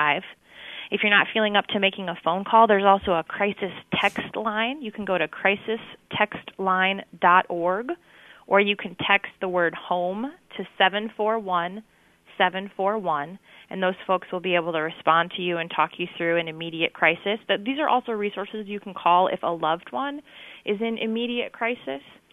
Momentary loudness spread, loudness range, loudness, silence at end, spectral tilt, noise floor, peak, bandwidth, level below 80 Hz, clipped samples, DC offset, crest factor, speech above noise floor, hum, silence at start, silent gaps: 14 LU; 5 LU; -24 LUFS; 0.3 s; -6 dB/octave; -44 dBFS; -4 dBFS; 13.5 kHz; -64 dBFS; under 0.1%; under 0.1%; 20 dB; 19 dB; none; 0 s; none